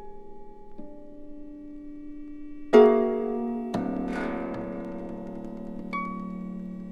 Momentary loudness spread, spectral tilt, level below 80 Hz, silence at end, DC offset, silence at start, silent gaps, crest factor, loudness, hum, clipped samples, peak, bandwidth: 26 LU; -7.5 dB/octave; -50 dBFS; 0 s; under 0.1%; 0 s; none; 24 dB; -27 LUFS; none; under 0.1%; -4 dBFS; 8.4 kHz